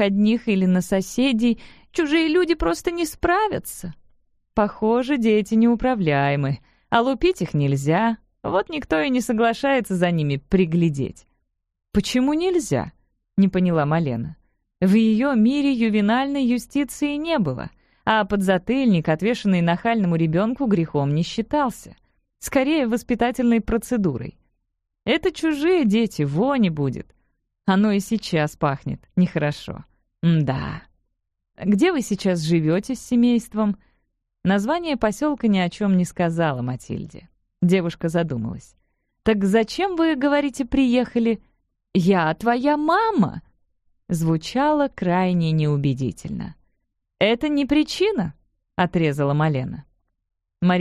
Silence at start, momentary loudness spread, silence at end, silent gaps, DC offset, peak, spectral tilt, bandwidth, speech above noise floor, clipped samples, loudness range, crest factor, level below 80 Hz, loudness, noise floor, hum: 0 s; 10 LU; 0 s; none; under 0.1%; -4 dBFS; -6.5 dB/octave; 14.5 kHz; 56 dB; under 0.1%; 3 LU; 18 dB; -46 dBFS; -21 LUFS; -76 dBFS; none